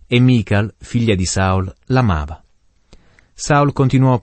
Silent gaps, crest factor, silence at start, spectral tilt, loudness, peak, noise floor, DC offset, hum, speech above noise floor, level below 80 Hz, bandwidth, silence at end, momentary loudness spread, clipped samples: none; 14 dB; 0.1 s; -6 dB/octave; -16 LUFS; -2 dBFS; -52 dBFS; under 0.1%; none; 37 dB; -36 dBFS; 8.8 kHz; 0 s; 8 LU; under 0.1%